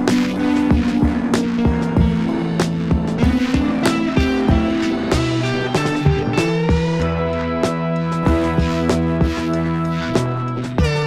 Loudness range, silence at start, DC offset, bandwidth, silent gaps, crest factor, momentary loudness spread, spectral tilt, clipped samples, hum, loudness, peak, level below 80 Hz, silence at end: 1 LU; 0 s; under 0.1%; 14 kHz; none; 14 dB; 3 LU; -6.5 dB/octave; under 0.1%; none; -18 LUFS; -2 dBFS; -28 dBFS; 0 s